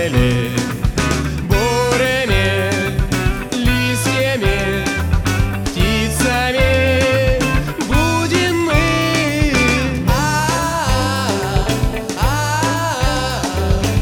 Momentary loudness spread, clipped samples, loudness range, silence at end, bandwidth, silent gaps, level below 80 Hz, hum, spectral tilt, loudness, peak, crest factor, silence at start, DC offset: 5 LU; under 0.1%; 2 LU; 0 s; 19.5 kHz; none; -24 dBFS; none; -5 dB/octave; -16 LUFS; 0 dBFS; 16 dB; 0 s; under 0.1%